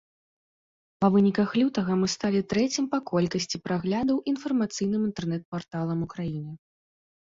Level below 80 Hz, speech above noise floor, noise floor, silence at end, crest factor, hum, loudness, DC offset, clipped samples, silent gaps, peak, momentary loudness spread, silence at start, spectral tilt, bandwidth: -60 dBFS; over 64 dB; under -90 dBFS; 0.7 s; 18 dB; none; -27 LUFS; under 0.1%; under 0.1%; 5.45-5.52 s; -10 dBFS; 9 LU; 1 s; -6 dB/octave; 7.8 kHz